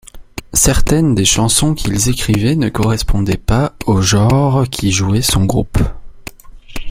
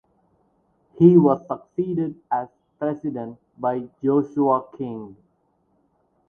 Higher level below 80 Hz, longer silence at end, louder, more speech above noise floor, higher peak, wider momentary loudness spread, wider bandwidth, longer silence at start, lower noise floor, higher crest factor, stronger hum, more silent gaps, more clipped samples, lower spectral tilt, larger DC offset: first, -24 dBFS vs -64 dBFS; second, 0 s vs 1.15 s; first, -14 LUFS vs -22 LUFS; second, 20 dB vs 46 dB; about the same, 0 dBFS vs -2 dBFS; about the same, 20 LU vs 18 LU; first, 16.5 kHz vs 3.4 kHz; second, 0.15 s vs 1 s; second, -33 dBFS vs -67 dBFS; second, 14 dB vs 22 dB; neither; neither; neither; second, -4.5 dB/octave vs -11.5 dB/octave; neither